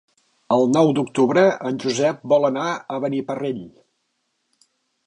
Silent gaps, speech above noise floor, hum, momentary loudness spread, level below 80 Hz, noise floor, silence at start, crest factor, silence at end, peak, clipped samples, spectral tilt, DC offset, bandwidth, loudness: none; 53 dB; none; 10 LU; -70 dBFS; -72 dBFS; 0.5 s; 16 dB; 1.4 s; -4 dBFS; under 0.1%; -5.5 dB/octave; under 0.1%; 10.5 kHz; -20 LUFS